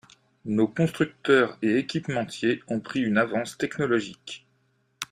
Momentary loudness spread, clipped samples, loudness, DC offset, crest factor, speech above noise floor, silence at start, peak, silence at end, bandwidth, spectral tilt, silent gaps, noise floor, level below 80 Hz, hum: 16 LU; under 0.1%; -25 LUFS; under 0.1%; 20 dB; 43 dB; 0.45 s; -6 dBFS; 0.05 s; 14.5 kHz; -6 dB/octave; none; -69 dBFS; -64 dBFS; none